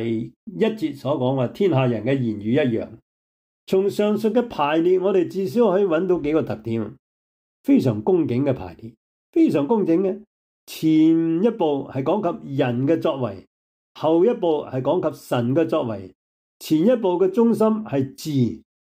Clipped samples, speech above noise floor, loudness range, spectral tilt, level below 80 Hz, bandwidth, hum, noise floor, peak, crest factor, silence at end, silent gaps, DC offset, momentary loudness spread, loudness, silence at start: under 0.1%; over 70 dB; 2 LU; -7.5 dB/octave; -60 dBFS; 16 kHz; none; under -90 dBFS; -8 dBFS; 14 dB; 0.35 s; 0.36-0.47 s, 3.02-3.67 s, 6.99-7.64 s, 8.97-9.33 s, 10.27-10.67 s, 13.47-13.95 s, 16.15-16.60 s; under 0.1%; 10 LU; -21 LUFS; 0 s